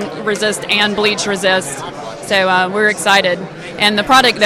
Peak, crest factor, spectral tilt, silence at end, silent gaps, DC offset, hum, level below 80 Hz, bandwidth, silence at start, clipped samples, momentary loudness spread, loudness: 0 dBFS; 14 dB; -2.5 dB/octave; 0 s; none; under 0.1%; none; -48 dBFS; 16.5 kHz; 0 s; under 0.1%; 14 LU; -13 LUFS